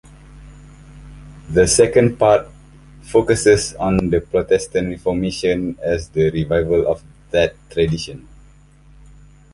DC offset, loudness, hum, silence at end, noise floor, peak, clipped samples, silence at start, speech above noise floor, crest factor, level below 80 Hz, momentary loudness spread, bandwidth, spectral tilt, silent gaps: under 0.1%; -17 LUFS; none; 1.35 s; -47 dBFS; -2 dBFS; under 0.1%; 0.3 s; 30 dB; 18 dB; -38 dBFS; 8 LU; 11.5 kHz; -5 dB/octave; none